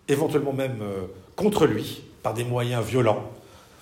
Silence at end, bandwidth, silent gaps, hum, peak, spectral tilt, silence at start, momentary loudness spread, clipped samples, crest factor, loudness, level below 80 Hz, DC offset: 0.25 s; 16 kHz; none; none; -6 dBFS; -6 dB/octave; 0.1 s; 12 LU; under 0.1%; 18 dB; -25 LUFS; -56 dBFS; under 0.1%